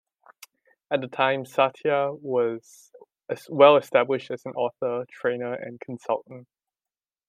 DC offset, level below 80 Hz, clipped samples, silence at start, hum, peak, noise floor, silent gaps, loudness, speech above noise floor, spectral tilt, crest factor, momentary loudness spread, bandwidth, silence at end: under 0.1%; -80 dBFS; under 0.1%; 0.9 s; none; -2 dBFS; under -90 dBFS; none; -24 LUFS; over 66 dB; -5.5 dB/octave; 24 dB; 18 LU; 14.5 kHz; 0.85 s